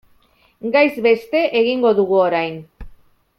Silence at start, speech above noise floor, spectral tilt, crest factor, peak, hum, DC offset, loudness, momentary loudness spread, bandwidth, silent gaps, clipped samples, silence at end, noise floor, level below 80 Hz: 0.65 s; 40 dB; -6.5 dB/octave; 16 dB; -2 dBFS; none; under 0.1%; -17 LUFS; 11 LU; 13.5 kHz; none; under 0.1%; 0.5 s; -56 dBFS; -48 dBFS